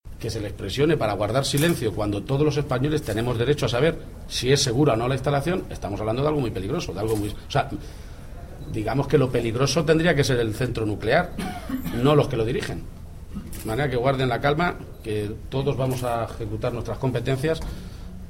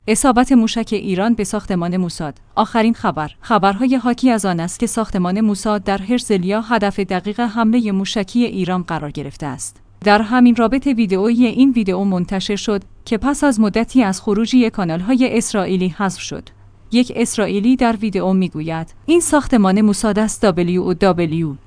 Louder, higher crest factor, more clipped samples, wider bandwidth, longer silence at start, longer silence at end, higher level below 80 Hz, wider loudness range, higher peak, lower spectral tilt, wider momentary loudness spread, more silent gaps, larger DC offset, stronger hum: second, -24 LUFS vs -16 LUFS; about the same, 20 dB vs 16 dB; neither; first, 16.5 kHz vs 10.5 kHz; about the same, 0.05 s vs 0.05 s; about the same, 0 s vs 0.1 s; about the same, -38 dBFS vs -40 dBFS; about the same, 4 LU vs 3 LU; second, -4 dBFS vs 0 dBFS; about the same, -5.5 dB/octave vs -5.5 dB/octave; first, 14 LU vs 8 LU; neither; neither; neither